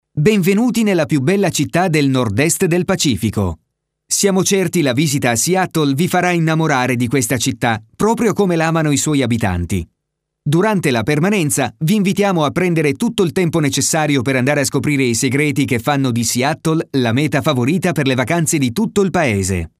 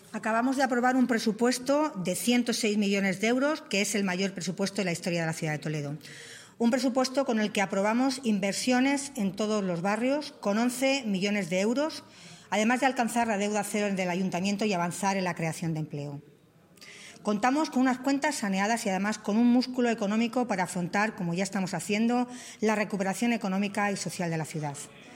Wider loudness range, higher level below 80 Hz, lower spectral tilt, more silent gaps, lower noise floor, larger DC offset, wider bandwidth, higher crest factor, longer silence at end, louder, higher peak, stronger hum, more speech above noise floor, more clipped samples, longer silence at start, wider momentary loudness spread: about the same, 2 LU vs 4 LU; first, -44 dBFS vs -72 dBFS; about the same, -5 dB/octave vs -4.5 dB/octave; neither; first, -76 dBFS vs -58 dBFS; neither; about the same, 16 kHz vs 16 kHz; about the same, 16 dB vs 18 dB; about the same, 0.1 s vs 0 s; first, -16 LUFS vs -28 LUFS; first, 0 dBFS vs -10 dBFS; neither; first, 60 dB vs 30 dB; neither; about the same, 0.15 s vs 0.1 s; second, 3 LU vs 8 LU